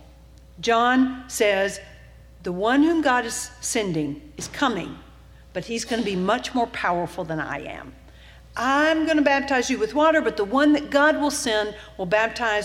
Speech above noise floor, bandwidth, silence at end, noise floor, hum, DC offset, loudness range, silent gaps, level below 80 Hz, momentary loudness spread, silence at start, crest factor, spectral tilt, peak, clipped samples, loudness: 25 dB; 15.5 kHz; 0 s; -48 dBFS; none; under 0.1%; 7 LU; none; -50 dBFS; 13 LU; 0 s; 18 dB; -3.5 dB/octave; -6 dBFS; under 0.1%; -22 LUFS